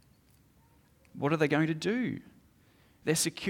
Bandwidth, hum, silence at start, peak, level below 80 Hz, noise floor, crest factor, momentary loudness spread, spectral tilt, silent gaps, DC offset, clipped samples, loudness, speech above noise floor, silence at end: 18.5 kHz; none; 1.15 s; -14 dBFS; -68 dBFS; -64 dBFS; 20 dB; 13 LU; -4.5 dB/octave; none; under 0.1%; under 0.1%; -30 LUFS; 34 dB; 0 s